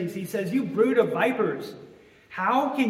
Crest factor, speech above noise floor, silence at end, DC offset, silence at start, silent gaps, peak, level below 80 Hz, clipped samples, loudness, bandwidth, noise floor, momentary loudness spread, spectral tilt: 18 dB; 24 dB; 0 s; under 0.1%; 0 s; none; -8 dBFS; -70 dBFS; under 0.1%; -25 LUFS; 16 kHz; -48 dBFS; 13 LU; -6.5 dB/octave